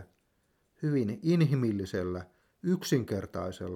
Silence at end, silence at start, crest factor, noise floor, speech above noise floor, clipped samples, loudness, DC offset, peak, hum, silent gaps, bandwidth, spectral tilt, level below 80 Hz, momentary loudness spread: 0 s; 0 s; 16 dB; -73 dBFS; 44 dB; under 0.1%; -31 LUFS; under 0.1%; -14 dBFS; none; none; 16.5 kHz; -7 dB/octave; -64 dBFS; 11 LU